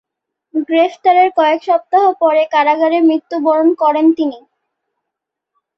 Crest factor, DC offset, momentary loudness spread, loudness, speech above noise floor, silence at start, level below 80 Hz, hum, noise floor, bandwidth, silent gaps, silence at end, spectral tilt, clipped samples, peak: 12 dB; under 0.1%; 5 LU; -13 LUFS; 67 dB; 0.55 s; -66 dBFS; none; -80 dBFS; 6.2 kHz; none; 1.4 s; -4.5 dB/octave; under 0.1%; -2 dBFS